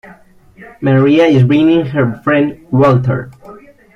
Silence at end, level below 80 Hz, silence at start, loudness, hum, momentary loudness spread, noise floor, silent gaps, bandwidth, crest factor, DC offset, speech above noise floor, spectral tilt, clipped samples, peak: 0.4 s; -46 dBFS; 0.6 s; -12 LUFS; none; 10 LU; -41 dBFS; none; 6.6 kHz; 12 dB; under 0.1%; 30 dB; -9 dB/octave; under 0.1%; 0 dBFS